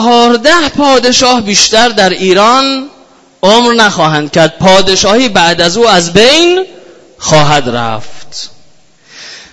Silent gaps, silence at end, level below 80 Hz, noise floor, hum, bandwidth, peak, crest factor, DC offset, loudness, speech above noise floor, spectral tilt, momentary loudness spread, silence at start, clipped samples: none; 0.1 s; -38 dBFS; -44 dBFS; none; 11 kHz; 0 dBFS; 8 dB; under 0.1%; -7 LUFS; 37 dB; -3 dB/octave; 17 LU; 0 s; 2%